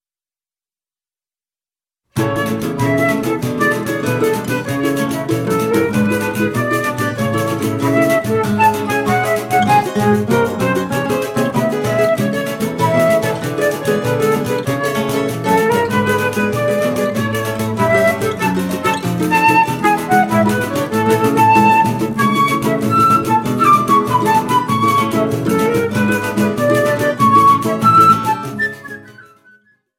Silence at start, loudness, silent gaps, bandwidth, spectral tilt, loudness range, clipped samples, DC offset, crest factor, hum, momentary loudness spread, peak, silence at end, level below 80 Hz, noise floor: 2.15 s; -15 LUFS; none; 16.5 kHz; -5.5 dB/octave; 4 LU; under 0.1%; under 0.1%; 14 dB; none; 7 LU; 0 dBFS; 0.75 s; -48 dBFS; under -90 dBFS